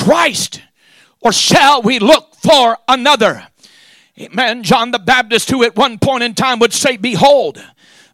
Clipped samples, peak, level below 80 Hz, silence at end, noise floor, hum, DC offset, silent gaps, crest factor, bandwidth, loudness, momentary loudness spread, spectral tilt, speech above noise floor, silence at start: under 0.1%; 0 dBFS; -48 dBFS; 0.5 s; -49 dBFS; none; under 0.1%; none; 12 dB; 16.5 kHz; -11 LUFS; 7 LU; -3 dB/octave; 38 dB; 0 s